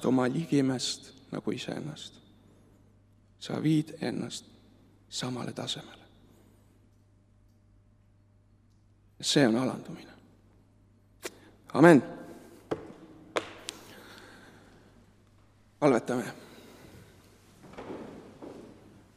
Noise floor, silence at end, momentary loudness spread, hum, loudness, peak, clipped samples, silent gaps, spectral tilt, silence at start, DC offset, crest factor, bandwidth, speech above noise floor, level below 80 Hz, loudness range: -62 dBFS; 0.5 s; 25 LU; none; -29 LUFS; -4 dBFS; under 0.1%; none; -5 dB/octave; 0 s; under 0.1%; 28 dB; 15.5 kHz; 35 dB; -68 dBFS; 14 LU